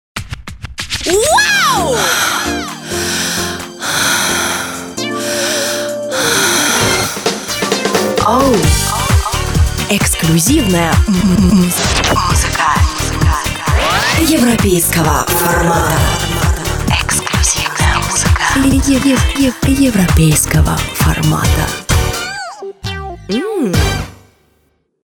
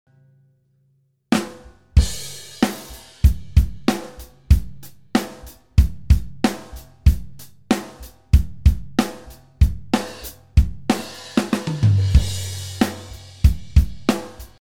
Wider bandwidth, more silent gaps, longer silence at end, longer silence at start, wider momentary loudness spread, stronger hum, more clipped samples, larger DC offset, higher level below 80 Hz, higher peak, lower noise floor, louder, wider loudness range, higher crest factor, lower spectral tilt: first, over 20 kHz vs 16.5 kHz; neither; first, 0.9 s vs 0.05 s; about the same, 0.15 s vs 0.05 s; second, 9 LU vs 17 LU; neither; neither; second, under 0.1% vs 0.6%; about the same, -22 dBFS vs -24 dBFS; about the same, 0 dBFS vs 0 dBFS; second, -59 dBFS vs -63 dBFS; first, -13 LUFS vs -21 LUFS; about the same, 4 LU vs 2 LU; second, 12 dB vs 20 dB; second, -4 dB/octave vs -6 dB/octave